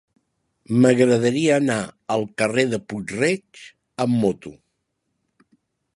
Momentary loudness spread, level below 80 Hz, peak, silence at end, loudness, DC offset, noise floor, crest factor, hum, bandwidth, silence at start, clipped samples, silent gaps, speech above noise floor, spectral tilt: 12 LU; -62 dBFS; -2 dBFS; 1.45 s; -21 LUFS; under 0.1%; -75 dBFS; 20 dB; none; 11.5 kHz; 0.7 s; under 0.1%; none; 55 dB; -5.5 dB/octave